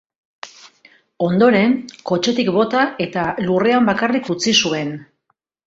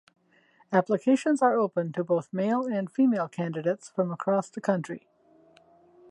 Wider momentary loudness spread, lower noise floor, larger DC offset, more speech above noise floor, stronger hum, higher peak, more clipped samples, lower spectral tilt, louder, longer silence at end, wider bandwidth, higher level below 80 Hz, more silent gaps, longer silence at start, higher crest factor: first, 18 LU vs 7 LU; first, -69 dBFS vs -63 dBFS; neither; first, 52 dB vs 37 dB; neither; first, -2 dBFS vs -8 dBFS; neither; second, -4.5 dB/octave vs -7 dB/octave; first, -17 LUFS vs -27 LUFS; second, 0.65 s vs 1.15 s; second, 8 kHz vs 11 kHz; first, -58 dBFS vs -80 dBFS; neither; second, 0.45 s vs 0.7 s; about the same, 18 dB vs 20 dB